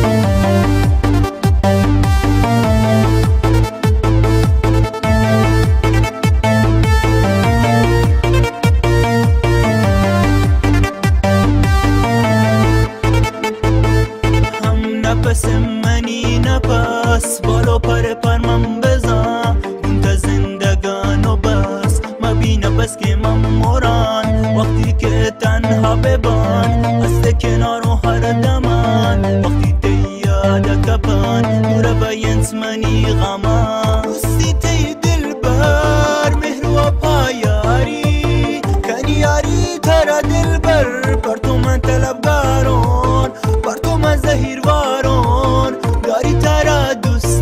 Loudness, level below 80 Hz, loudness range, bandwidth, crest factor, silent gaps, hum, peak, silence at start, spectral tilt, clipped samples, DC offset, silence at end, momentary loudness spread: -14 LUFS; -20 dBFS; 2 LU; 15.5 kHz; 12 dB; none; none; -2 dBFS; 0 s; -6 dB/octave; under 0.1%; under 0.1%; 0 s; 4 LU